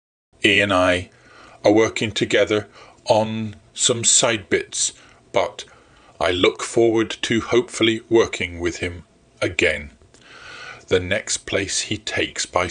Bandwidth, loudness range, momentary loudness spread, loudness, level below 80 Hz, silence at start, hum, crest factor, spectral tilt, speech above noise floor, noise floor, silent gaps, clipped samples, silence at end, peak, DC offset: 10.5 kHz; 5 LU; 13 LU; -20 LUFS; -50 dBFS; 0.4 s; none; 20 dB; -3 dB/octave; 26 dB; -45 dBFS; none; under 0.1%; 0 s; 0 dBFS; under 0.1%